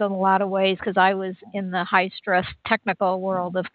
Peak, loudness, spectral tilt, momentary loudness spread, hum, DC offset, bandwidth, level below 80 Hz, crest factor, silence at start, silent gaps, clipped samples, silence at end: -4 dBFS; -22 LUFS; -9.5 dB/octave; 7 LU; none; under 0.1%; 4.8 kHz; -60 dBFS; 18 dB; 0 s; none; under 0.1%; 0.05 s